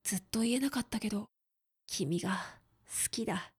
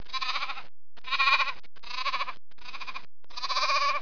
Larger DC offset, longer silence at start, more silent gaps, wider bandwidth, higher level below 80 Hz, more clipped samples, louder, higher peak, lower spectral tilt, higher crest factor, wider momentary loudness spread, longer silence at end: second, under 0.1% vs 3%; about the same, 0.05 s vs 0.1 s; neither; first, 19.5 kHz vs 5.4 kHz; about the same, -64 dBFS vs -66 dBFS; neither; second, -35 LUFS vs -28 LUFS; second, -18 dBFS vs -8 dBFS; first, -3.5 dB/octave vs 0 dB/octave; about the same, 18 dB vs 22 dB; second, 9 LU vs 21 LU; about the same, 0.1 s vs 0 s